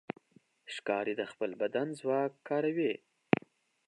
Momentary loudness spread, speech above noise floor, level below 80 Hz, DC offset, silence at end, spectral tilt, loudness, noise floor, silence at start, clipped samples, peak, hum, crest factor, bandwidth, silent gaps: 12 LU; 32 dB; -76 dBFS; under 0.1%; 0.9 s; -6.5 dB/octave; -34 LUFS; -66 dBFS; 0.65 s; under 0.1%; -6 dBFS; none; 28 dB; 11.5 kHz; none